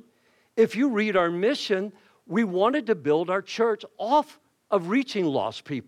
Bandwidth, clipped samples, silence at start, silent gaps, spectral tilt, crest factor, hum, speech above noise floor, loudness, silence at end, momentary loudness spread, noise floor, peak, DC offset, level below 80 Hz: 12 kHz; under 0.1%; 0.55 s; none; -5.5 dB/octave; 16 dB; none; 40 dB; -25 LUFS; 0.05 s; 7 LU; -64 dBFS; -10 dBFS; under 0.1%; -72 dBFS